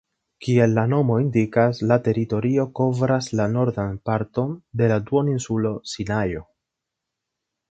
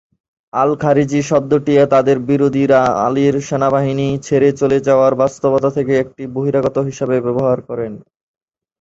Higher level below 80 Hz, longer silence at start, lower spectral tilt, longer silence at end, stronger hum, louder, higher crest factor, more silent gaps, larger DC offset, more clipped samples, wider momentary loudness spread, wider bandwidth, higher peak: about the same, -50 dBFS vs -50 dBFS; second, 0.4 s vs 0.55 s; about the same, -7.5 dB/octave vs -7 dB/octave; first, 1.3 s vs 0.85 s; neither; second, -22 LUFS vs -15 LUFS; first, 20 dB vs 14 dB; neither; neither; neither; about the same, 8 LU vs 7 LU; first, 8.6 kHz vs 7.8 kHz; about the same, -2 dBFS vs -2 dBFS